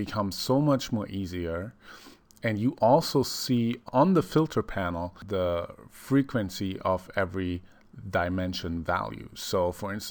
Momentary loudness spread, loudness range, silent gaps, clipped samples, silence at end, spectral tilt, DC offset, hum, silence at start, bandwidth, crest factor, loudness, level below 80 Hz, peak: 13 LU; 5 LU; none; under 0.1%; 0 s; -6 dB/octave; under 0.1%; none; 0 s; over 20 kHz; 18 dB; -28 LUFS; -52 dBFS; -10 dBFS